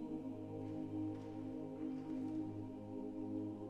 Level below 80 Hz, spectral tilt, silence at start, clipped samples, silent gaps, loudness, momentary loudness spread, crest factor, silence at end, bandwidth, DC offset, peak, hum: -68 dBFS; -9.5 dB/octave; 0 s; under 0.1%; none; -46 LUFS; 4 LU; 12 dB; 0 s; 8.2 kHz; under 0.1%; -34 dBFS; none